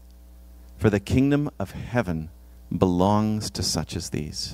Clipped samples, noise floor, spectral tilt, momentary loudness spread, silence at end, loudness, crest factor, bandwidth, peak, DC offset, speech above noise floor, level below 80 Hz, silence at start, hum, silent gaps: under 0.1%; -47 dBFS; -5.5 dB/octave; 11 LU; 0 s; -25 LUFS; 20 dB; 16 kHz; -4 dBFS; under 0.1%; 23 dB; -44 dBFS; 0 s; none; none